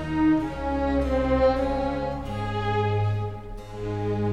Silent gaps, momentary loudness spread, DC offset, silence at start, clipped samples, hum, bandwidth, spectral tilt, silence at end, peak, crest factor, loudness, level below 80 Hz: none; 11 LU; 0.5%; 0 s; under 0.1%; none; 9.8 kHz; -8 dB/octave; 0 s; -10 dBFS; 14 dB; -26 LUFS; -36 dBFS